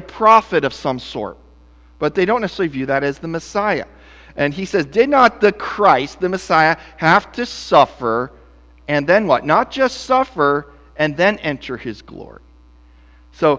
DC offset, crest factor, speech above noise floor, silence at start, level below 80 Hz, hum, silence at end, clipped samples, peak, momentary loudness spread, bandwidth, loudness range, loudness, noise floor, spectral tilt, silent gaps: under 0.1%; 18 dB; 30 dB; 0 s; -46 dBFS; none; 0 s; under 0.1%; 0 dBFS; 15 LU; 8 kHz; 6 LU; -17 LUFS; -46 dBFS; -5.5 dB/octave; none